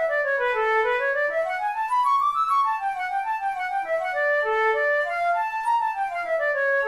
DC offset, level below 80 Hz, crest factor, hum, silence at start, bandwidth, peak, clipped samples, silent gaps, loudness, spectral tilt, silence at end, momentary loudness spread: under 0.1%; -62 dBFS; 10 dB; none; 0 s; 14 kHz; -12 dBFS; under 0.1%; none; -23 LUFS; -1 dB/octave; 0 s; 5 LU